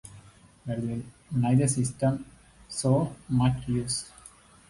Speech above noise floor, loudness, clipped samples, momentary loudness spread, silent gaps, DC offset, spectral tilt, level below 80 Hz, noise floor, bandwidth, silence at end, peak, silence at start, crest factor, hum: 27 dB; -28 LUFS; under 0.1%; 13 LU; none; under 0.1%; -6 dB/octave; -52 dBFS; -53 dBFS; 11.5 kHz; 0.4 s; -12 dBFS; 0.05 s; 16 dB; none